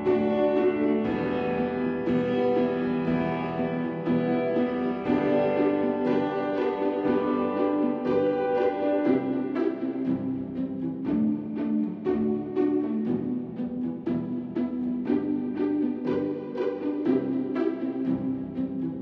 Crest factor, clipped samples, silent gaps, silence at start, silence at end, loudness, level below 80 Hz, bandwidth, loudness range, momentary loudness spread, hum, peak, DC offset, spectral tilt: 14 dB; under 0.1%; none; 0 s; 0 s; -27 LUFS; -60 dBFS; 5.6 kHz; 3 LU; 6 LU; none; -12 dBFS; under 0.1%; -9.5 dB/octave